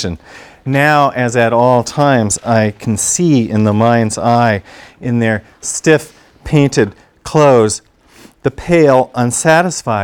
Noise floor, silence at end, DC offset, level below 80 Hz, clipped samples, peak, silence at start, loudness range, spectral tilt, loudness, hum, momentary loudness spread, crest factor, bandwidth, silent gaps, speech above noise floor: -43 dBFS; 0 s; under 0.1%; -42 dBFS; 0.4%; 0 dBFS; 0 s; 2 LU; -5 dB/octave; -13 LUFS; none; 11 LU; 12 dB; 18 kHz; none; 31 dB